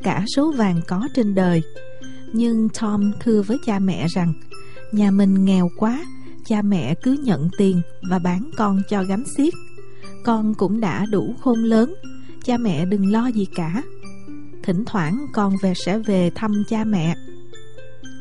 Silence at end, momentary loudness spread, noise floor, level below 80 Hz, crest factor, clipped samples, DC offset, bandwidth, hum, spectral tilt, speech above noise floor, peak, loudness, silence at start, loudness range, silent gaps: 0 s; 14 LU; -42 dBFS; -52 dBFS; 14 dB; under 0.1%; 4%; 11.5 kHz; none; -7 dB/octave; 23 dB; -6 dBFS; -20 LUFS; 0 s; 3 LU; none